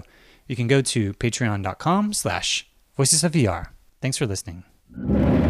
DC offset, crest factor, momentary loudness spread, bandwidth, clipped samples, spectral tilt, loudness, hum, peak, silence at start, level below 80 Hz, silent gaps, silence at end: under 0.1%; 18 dB; 15 LU; 15.5 kHz; under 0.1%; -4.5 dB/octave; -22 LUFS; none; -4 dBFS; 0.5 s; -40 dBFS; none; 0 s